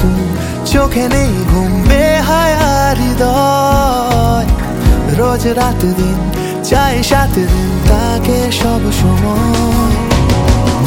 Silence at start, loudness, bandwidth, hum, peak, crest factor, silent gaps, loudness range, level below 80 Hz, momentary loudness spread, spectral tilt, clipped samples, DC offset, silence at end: 0 s; -12 LUFS; 17 kHz; none; 0 dBFS; 10 dB; none; 2 LU; -16 dBFS; 3 LU; -5.5 dB/octave; under 0.1%; 0.2%; 0 s